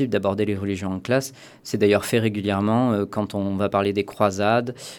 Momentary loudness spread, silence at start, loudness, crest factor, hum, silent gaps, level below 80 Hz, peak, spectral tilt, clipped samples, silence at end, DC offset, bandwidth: 7 LU; 0 s; -22 LUFS; 18 dB; none; none; -62 dBFS; -4 dBFS; -6 dB/octave; under 0.1%; 0 s; under 0.1%; 19 kHz